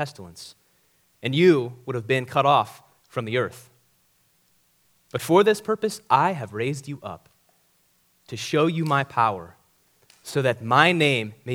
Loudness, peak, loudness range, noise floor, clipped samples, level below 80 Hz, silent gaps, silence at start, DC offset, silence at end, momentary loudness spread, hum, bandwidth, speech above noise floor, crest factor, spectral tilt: -22 LUFS; 0 dBFS; 4 LU; -65 dBFS; under 0.1%; -68 dBFS; none; 0 s; under 0.1%; 0 s; 18 LU; none; 17 kHz; 42 dB; 24 dB; -5.5 dB/octave